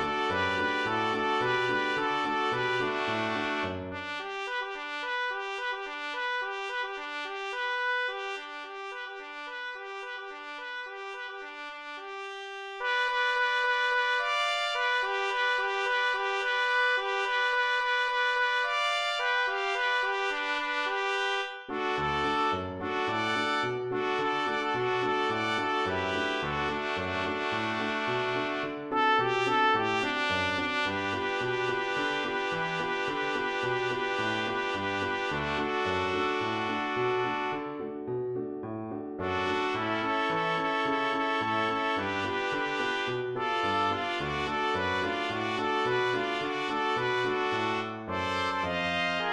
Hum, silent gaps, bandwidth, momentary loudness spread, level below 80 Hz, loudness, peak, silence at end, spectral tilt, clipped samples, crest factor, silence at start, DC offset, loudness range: none; none; 12 kHz; 10 LU; -62 dBFS; -29 LUFS; -14 dBFS; 0 s; -4 dB/octave; under 0.1%; 16 dB; 0 s; under 0.1%; 6 LU